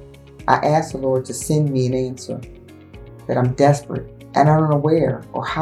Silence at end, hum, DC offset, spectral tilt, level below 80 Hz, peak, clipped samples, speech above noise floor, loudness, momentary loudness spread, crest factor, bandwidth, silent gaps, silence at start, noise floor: 0 s; none; under 0.1%; -6.5 dB/octave; -46 dBFS; 0 dBFS; under 0.1%; 22 dB; -19 LUFS; 14 LU; 20 dB; 13 kHz; none; 0 s; -40 dBFS